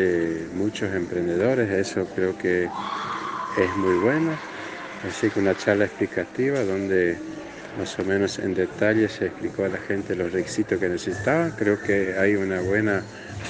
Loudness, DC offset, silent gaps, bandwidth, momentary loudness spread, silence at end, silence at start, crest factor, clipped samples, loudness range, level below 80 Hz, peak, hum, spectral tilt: -24 LUFS; under 0.1%; none; 9.6 kHz; 8 LU; 0 s; 0 s; 18 dB; under 0.1%; 1 LU; -56 dBFS; -6 dBFS; none; -6 dB/octave